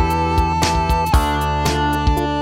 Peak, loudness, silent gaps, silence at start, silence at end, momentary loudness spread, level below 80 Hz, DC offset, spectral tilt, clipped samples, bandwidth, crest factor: -2 dBFS; -18 LUFS; none; 0 s; 0 s; 2 LU; -22 dBFS; under 0.1%; -5 dB/octave; under 0.1%; 17 kHz; 16 dB